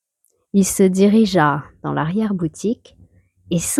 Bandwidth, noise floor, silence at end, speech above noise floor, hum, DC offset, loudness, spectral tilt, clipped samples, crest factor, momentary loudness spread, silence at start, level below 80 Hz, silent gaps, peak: 15.5 kHz; -67 dBFS; 0 s; 50 dB; none; under 0.1%; -18 LUFS; -5.5 dB/octave; under 0.1%; 16 dB; 11 LU; 0.55 s; -50 dBFS; none; -2 dBFS